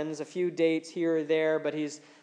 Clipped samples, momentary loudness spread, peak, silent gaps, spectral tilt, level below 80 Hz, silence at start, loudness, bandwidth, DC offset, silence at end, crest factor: under 0.1%; 8 LU; -14 dBFS; none; -5.5 dB/octave; under -90 dBFS; 0 s; -29 LUFS; 9.8 kHz; under 0.1%; 0.25 s; 14 dB